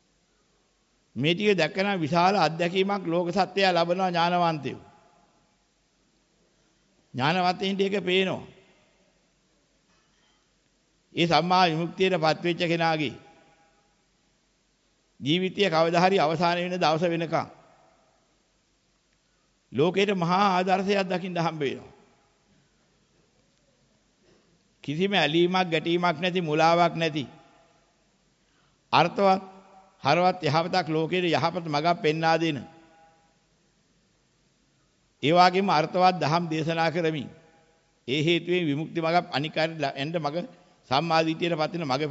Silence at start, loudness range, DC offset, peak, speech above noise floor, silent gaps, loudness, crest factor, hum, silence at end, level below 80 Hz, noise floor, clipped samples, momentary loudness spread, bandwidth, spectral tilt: 1.15 s; 7 LU; under 0.1%; -6 dBFS; 44 dB; none; -25 LUFS; 20 dB; none; 0 s; -68 dBFS; -68 dBFS; under 0.1%; 9 LU; 8 kHz; -5.5 dB/octave